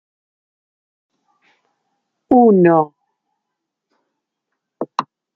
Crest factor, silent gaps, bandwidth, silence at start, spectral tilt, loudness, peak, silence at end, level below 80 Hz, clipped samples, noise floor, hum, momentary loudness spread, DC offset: 18 dB; none; 6.8 kHz; 2.3 s; -9 dB/octave; -15 LUFS; -2 dBFS; 0.35 s; -64 dBFS; under 0.1%; -79 dBFS; none; 16 LU; under 0.1%